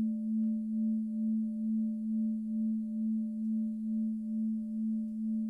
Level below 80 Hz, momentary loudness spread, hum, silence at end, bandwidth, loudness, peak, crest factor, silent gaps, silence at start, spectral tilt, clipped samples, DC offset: -72 dBFS; 2 LU; none; 0 s; 0.6 kHz; -34 LUFS; -26 dBFS; 6 dB; none; 0 s; -11.5 dB/octave; under 0.1%; under 0.1%